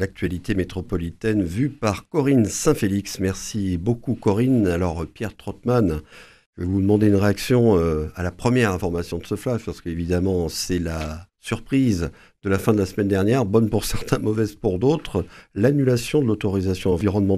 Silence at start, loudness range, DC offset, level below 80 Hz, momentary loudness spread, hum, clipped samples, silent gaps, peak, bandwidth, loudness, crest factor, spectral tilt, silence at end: 0 s; 3 LU; under 0.1%; -40 dBFS; 10 LU; none; under 0.1%; 6.46-6.53 s; -2 dBFS; 14.5 kHz; -22 LUFS; 20 dB; -6.5 dB/octave; 0 s